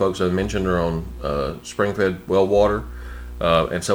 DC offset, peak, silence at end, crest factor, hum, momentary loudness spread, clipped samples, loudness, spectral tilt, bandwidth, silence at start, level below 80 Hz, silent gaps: under 0.1%; -4 dBFS; 0 s; 16 dB; 60 Hz at -40 dBFS; 9 LU; under 0.1%; -21 LUFS; -5.5 dB/octave; over 20 kHz; 0 s; -36 dBFS; none